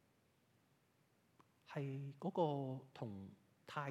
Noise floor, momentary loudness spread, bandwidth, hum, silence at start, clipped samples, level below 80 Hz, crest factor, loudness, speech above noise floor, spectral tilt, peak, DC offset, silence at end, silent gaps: -77 dBFS; 15 LU; 12.5 kHz; none; 1.7 s; under 0.1%; under -90 dBFS; 22 dB; -45 LUFS; 33 dB; -8 dB/octave; -26 dBFS; under 0.1%; 0 s; none